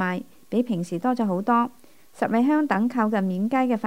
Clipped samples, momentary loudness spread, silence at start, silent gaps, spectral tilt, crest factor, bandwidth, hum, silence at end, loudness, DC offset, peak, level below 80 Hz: under 0.1%; 7 LU; 0 s; none; -7.5 dB/octave; 18 dB; 16 kHz; none; 0 s; -24 LUFS; 0.3%; -6 dBFS; -72 dBFS